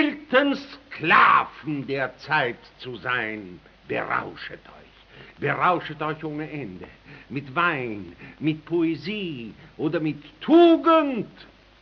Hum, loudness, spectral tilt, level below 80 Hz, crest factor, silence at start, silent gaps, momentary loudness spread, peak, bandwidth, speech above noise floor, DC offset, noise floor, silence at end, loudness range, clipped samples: none; -23 LUFS; -3.5 dB/octave; -60 dBFS; 20 dB; 0 s; none; 22 LU; -4 dBFS; 6.2 kHz; 25 dB; under 0.1%; -48 dBFS; 0.4 s; 7 LU; under 0.1%